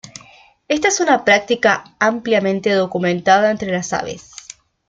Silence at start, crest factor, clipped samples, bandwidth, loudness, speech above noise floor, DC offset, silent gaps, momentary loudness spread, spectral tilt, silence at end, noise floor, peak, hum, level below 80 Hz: 0.05 s; 16 dB; under 0.1%; 9.4 kHz; -16 LUFS; 31 dB; under 0.1%; none; 16 LU; -3.5 dB/octave; 0.7 s; -47 dBFS; -2 dBFS; none; -56 dBFS